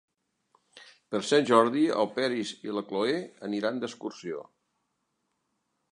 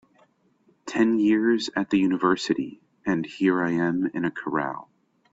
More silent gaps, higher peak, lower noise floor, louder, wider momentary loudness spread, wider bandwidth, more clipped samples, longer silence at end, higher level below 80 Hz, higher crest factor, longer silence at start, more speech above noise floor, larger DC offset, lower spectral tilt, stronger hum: neither; about the same, -6 dBFS vs -8 dBFS; first, -79 dBFS vs -64 dBFS; second, -28 LUFS vs -24 LUFS; first, 15 LU vs 11 LU; first, 11 kHz vs 8 kHz; neither; first, 1.5 s vs 0.5 s; second, -80 dBFS vs -64 dBFS; first, 24 dB vs 16 dB; about the same, 0.75 s vs 0.85 s; first, 51 dB vs 40 dB; neither; second, -4.5 dB/octave vs -6 dB/octave; neither